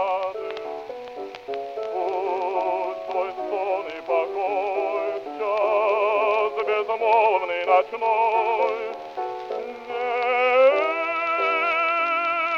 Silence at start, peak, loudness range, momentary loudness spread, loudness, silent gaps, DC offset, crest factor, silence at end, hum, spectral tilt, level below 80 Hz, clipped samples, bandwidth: 0 s; -6 dBFS; 6 LU; 13 LU; -23 LUFS; none; under 0.1%; 18 dB; 0 s; none; -3.5 dB/octave; -70 dBFS; under 0.1%; 7.2 kHz